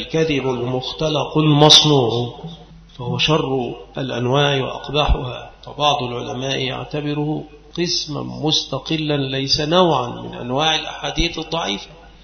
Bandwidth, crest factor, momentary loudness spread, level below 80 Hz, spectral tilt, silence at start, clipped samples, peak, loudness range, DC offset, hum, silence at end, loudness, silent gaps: 11 kHz; 20 dB; 13 LU; -34 dBFS; -4.5 dB/octave; 0 s; under 0.1%; 0 dBFS; 6 LU; under 0.1%; none; 0.15 s; -18 LUFS; none